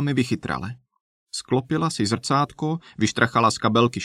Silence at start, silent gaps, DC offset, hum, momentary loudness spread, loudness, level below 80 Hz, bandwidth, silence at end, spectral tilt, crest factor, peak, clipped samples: 0 s; 1.00-1.26 s; under 0.1%; none; 11 LU; -23 LUFS; -56 dBFS; 13.5 kHz; 0 s; -5 dB/octave; 20 dB; -4 dBFS; under 0.1%